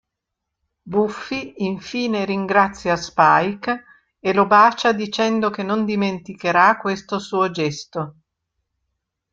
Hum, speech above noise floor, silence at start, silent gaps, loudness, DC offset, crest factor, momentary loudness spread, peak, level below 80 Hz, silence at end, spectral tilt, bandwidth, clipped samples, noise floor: none; 62 dB; 0.85 s; none; -19 LUFS; under 0.1%; 18 dB; 12 LU; -2 dBFS; -58 dBFS; 1.2 s; -5 dB/octave; 7.8 kHz; under 0.1%; -81 dBFS